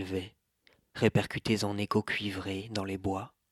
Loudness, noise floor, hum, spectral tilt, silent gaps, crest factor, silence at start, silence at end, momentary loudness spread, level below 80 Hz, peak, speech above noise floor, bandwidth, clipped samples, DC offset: -32 LUFS; -68 dBFS; none; -5.5 dB/octave; none; 22 dB; 0 s; 0.25 s; 10 LU; -62 dBFS; -10 dBFS; 37 dB; 14.5 kHz; under 0.1%; under 0.1%